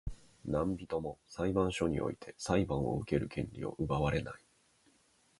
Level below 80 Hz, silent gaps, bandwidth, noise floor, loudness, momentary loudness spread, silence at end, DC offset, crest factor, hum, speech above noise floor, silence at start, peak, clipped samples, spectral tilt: -50 dBFS; none; 11.5 kHz; -70 dBFS; -35 LUFS; 11 LU; 1 s; under 0.1%; 20 dB; none; 35 dB; 0.05 s; -16 dBFS; under 0.1%; -6.5 dB/octave